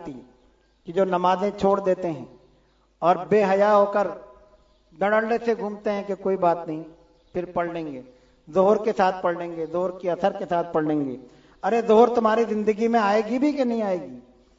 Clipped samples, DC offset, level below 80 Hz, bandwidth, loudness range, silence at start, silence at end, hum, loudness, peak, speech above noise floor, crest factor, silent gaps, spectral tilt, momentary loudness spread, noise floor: under 0.1%; under 0.1%; -60 dBFS; 7.8 kHz; 4 LU; 0 s; 0.4 s; none; -23 LUFS; -4 dBFS; 39 dB; 20 dB; none; -7 dB/octave; 14 LU; -61 dBFS